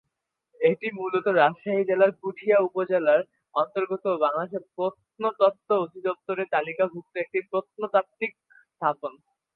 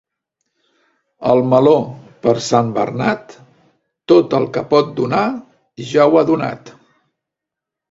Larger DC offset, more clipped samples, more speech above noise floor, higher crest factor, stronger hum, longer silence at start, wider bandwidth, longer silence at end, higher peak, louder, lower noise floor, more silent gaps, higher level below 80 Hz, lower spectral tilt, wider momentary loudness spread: neither; neither; second, 55 dB vs 69 dB; about the same, 20 dB vs 16 dB; neither; second, 0.6 s vs 1.2 s; second, 4.5 kHz vs 7.8 kHz; second, 0.45 s vs 1.2 s; second, -6 dBFS vs 0 dBFS; second, -26 LUFS vs -15 LUFS; about the same, -80 dBFS vs -83 dBFS; neither; second, -80 dBFS vs -58 dBFS; first, -8.5 dB/octave vs -6.5 dB/octave; second, 9 LU vs 14 LU